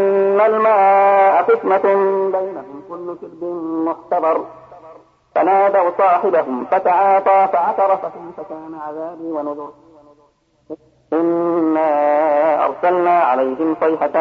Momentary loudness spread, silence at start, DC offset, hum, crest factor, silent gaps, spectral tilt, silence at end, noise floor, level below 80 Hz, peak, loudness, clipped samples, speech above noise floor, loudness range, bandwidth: 18 LU; 0 s; under 0.1%; none; 14 dB; none; -8 dB/octave; 0 s; -57 dBFS; -66 dBFS; -2 dBFS; -15 LUFS; under 0.1%; 41 dB; 8 LU; 5.4 kHz